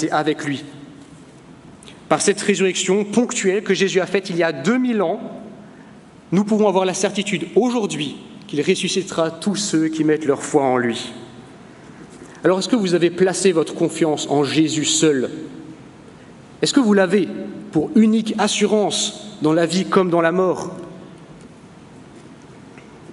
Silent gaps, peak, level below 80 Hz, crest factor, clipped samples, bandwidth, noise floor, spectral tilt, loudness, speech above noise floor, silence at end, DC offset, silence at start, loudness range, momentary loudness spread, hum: none; 0 dBFS; -62 dBFS; 20 dB; under 0.1%; 11.5 kHz; -43 dBFS; -4.5 dB/octave; -19 LUFS; 25 dB; 0 s; under 0.1%; 0 s; 3 LU; 15 LU; none